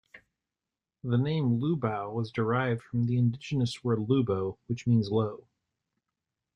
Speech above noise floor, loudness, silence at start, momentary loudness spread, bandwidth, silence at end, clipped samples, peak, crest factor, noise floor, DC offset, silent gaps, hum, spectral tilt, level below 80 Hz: over 62 dB; -29 LUFS; 0.15 s; 7 LU; 9.6 kHz; 1.2 s; under 0.1%; -12 dBFS; 18 dB; under -90 dBFS; under 0.1%; none; none; -8 dB/octave; -64 dBFS